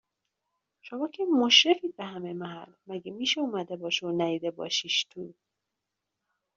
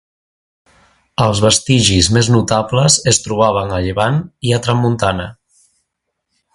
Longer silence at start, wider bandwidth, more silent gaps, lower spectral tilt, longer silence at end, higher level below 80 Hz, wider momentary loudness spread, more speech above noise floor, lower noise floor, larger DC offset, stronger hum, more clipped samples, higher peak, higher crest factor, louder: second, 0.85 s vs 1.2 s; second, 7.8 kHz vs 11.5 kHz; neither; second, -2.5 dB/octave vs -4 dB/octave; about the same, 1.25 s vs 1.2 s; second, -78 dBFS vs -36 dBFS; first, 21 LU vs 8 LU; about the same, 57 dB vs 60 dB; first, -85 dBFS vs -74 dBFS; neither; neither; neither; second, -6 dBFS vs 0 dBFS; first, 24 dB vs 16 dB; second, -26 LUFS vs -13 LUFS